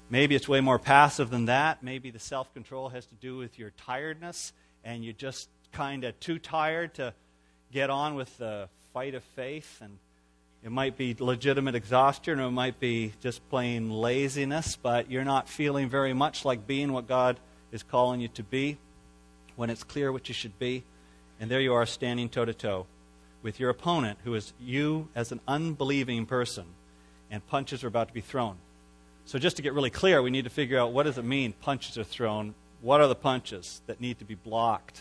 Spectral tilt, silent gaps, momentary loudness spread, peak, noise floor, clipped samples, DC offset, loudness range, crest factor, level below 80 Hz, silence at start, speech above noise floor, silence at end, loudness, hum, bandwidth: -5 dB/octave; none; 16 LU; -4 dBFS; -64 dBFS; under 0.1%; under 0.1%; 8 LU; 26 dB; -58 dBFS; 0.1 s; 35 dB; 0 s; -29 LUFS; none; 11 kHz